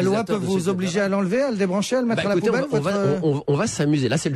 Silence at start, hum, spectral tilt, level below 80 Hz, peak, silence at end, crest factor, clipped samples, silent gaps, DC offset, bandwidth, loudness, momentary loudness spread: 0 s; none; -6 dB/octave; -56 dBFS; -10 dBFS; 0 s; 10 dB; under 0.1%; none; under 0.1%; 13 kHz; -21 LUFS; 2 LU